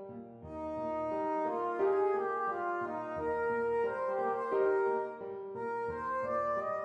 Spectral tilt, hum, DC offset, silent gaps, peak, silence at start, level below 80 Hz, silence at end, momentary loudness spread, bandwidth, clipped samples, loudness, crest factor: -7.5 dB/octave; none; under 0.1%; none; -20 dBFS; 0 s; -66 dBFS; 0 s; 10 LU; 7.2 kHz; under 0.1%; -34 LUFS; 14 dB